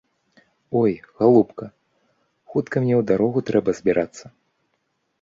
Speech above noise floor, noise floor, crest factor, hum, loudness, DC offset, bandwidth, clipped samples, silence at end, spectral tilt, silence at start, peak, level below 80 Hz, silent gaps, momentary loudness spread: 52 dB; -72 dBFS; 20 dB; none; -21 LUFS; under 0.1%; 7.6 kHz; under 0.1%; 0.95 s; -8 dB/octave; 0.7 s; -2 dBFS; -58 dBFS; none; 11 LU